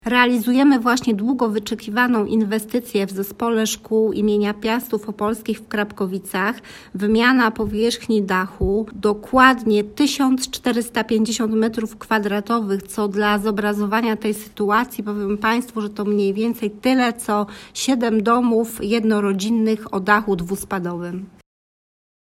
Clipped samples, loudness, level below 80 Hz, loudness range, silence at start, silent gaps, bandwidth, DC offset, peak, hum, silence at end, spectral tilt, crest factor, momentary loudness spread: under 0.1%; -20 LUFS; -46 dBFS; 3 LU; 0.05 s; none; 16 kHz; under 0.1%; 0 dBFS; none; 1 s; -4.5 dB/octave; 20 dB; 9 LU